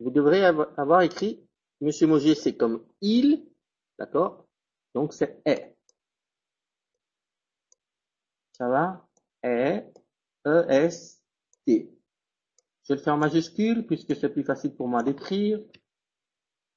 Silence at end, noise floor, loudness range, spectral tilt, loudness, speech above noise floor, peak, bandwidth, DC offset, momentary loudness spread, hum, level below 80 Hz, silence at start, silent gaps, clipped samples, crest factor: 1.15 s; -90 dBFS; 9 LU; -6.5 dB/octave; -25 LUFS; 66 dB; -6 dBFS; 7.6 kHz; under 0.1%; 11 LU; none; -68 dBFS; 0 s; none; under 0.1%; 20 dB